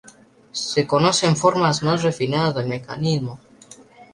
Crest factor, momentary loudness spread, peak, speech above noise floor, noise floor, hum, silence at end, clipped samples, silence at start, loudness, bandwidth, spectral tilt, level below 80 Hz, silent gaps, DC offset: 18 dB; 10 LU; -2 dBFS; 29 dB; -49 dBFS; none; 0.1 s; under 0.1%; 0.55 s; -20 LUFS; 11.5 kHz; -5 dB/octave; -56 dBFS; none; under 0.1%